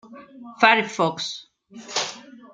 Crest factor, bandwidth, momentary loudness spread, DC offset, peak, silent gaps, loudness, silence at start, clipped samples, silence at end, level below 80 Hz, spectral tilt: 22 dB; 9.6 kHz; 25 LU; under 0.1%; -2 dBFS; none; -22 LUFS; 0.1 s; under 0.1%; 0.05 s; -76 dBFS; -2.5 dB/octave